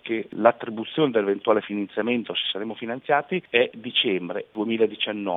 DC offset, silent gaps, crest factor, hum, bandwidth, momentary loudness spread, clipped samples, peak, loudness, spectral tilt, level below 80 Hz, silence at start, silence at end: under 0.1%; none; 24 dB; none; 4.5 kHz; 8 LU; under 0.1%; 0 dBFS; -24 LUFS; -8 dB/octave; -76 dBFS; 0.05 s; 0 s